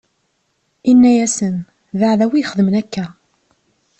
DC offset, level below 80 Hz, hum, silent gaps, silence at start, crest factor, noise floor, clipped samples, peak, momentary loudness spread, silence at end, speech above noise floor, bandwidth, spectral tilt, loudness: under 0.1%; -56 dBFS; none; none; 0.85 s; 14 dB; -66 dBFS; under 0.1%; -2 dBFS; 16 LU; 0.9 s; 52 dB; 8.8 kHz; -5.5 dB/octave; -15 LUFS